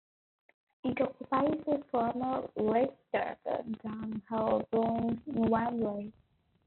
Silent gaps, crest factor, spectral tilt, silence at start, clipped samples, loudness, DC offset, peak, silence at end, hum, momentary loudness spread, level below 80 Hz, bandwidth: none; 16 dB; -6 dB/octave; 0.85 s; under 0.1%; -33 LUFS; under 0.1%; -16 dBFS; 0.55 s; none; 9 LU; -66 dBFS; 4.3 kHz